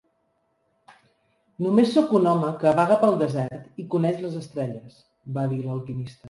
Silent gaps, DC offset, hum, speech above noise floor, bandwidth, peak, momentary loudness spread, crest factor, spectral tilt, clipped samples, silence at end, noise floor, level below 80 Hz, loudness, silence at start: none; under 0.1%; none; 48 dB; 11.5 kHz; -6 dBFS; 13 LU; 18 dB; -8 dB/octave; under 0.1%; 0 s; -70 dBFS; -64 dBFS; -23 LUFS; 1.6 s